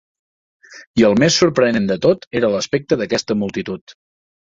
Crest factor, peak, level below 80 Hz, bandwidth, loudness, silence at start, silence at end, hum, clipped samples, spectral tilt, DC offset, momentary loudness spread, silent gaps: 16 dB; -2 dBFS; -50 dBFS; 7.8 kHz; -17 LUFS; 0.7 s; 0.6 s; none; under 0.1%; -4.5 dB/octave; under 0.1%; 10 LU; 0.87-0.94 s, 2.27-2.31 s, 3.81-3.87 s